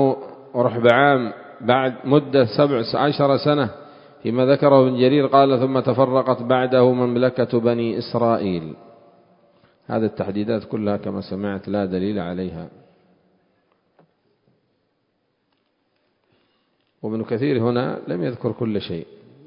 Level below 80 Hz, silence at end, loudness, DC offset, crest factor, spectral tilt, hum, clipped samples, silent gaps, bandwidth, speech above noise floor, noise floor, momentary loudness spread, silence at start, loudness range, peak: -56 dBFS; 0.4 s; -20 LUFS; under 0.1%; 20 dB; -9.5 dB/octave; none; under 0.1%; none; 5.4 kHz; 51 dB; -70 dBFS; 13 LU; 0 s; 12 LU; 0 dBFS